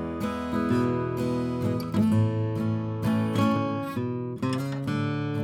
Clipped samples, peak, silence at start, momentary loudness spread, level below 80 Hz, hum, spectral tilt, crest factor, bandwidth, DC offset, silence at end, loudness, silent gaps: under 0.1%; -10 dBFS; 0 s; 6 LU; -52 dBFS; none; -8 dB/octave; 16 dB; 15 kHz; under 0.1%; 0 s; -27 LUFS; none